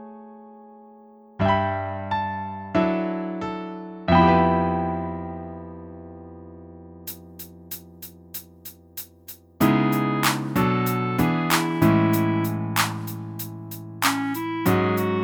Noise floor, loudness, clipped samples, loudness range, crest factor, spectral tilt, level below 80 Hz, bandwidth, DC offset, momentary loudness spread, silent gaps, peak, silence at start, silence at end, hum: -49 dBFS; -23 LUFS; under 0.1%; 16 LU; 20 dB; -5.5 dB/octave; -48 dBFS; over 20 kHz; under 0.1%; 22 LU; none; -4 dBFS; 0 s; 0 s; none